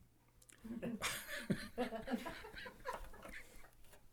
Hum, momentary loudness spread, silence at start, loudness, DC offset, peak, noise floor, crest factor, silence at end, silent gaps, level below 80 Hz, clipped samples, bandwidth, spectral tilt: none; 21 LU; 0 s; -46 LUFS; under 0.1%; -24 dBFS; -67 dBFS; 22 dB; 0 s; none; -62 dBFS; under 0.1%; over 20 kHz; -4 dB/octave